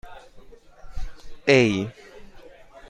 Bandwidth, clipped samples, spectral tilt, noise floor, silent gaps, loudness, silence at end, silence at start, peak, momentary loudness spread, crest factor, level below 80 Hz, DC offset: 10.5 kHz; under 0.1%; -5.5 dB/octave; -46 dBFS; none; -21 LUFS; 0.1 s; 0.05 s; -2 dBFS; 25 LU; 24 dB; -40 dBFS; under 0.1%